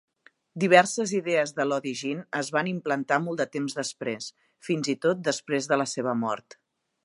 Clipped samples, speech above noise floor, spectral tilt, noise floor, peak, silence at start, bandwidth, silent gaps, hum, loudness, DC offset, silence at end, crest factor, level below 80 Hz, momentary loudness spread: under 0.1%; 26 dB; -4 dB/octave; -52 dBFS; -2 dBFS; 0.55 s; 11.5 kHz; none; none; -26 LUFS; under 0.1%; 0.65 s; 24 dB; -78 dBFS; 13 LU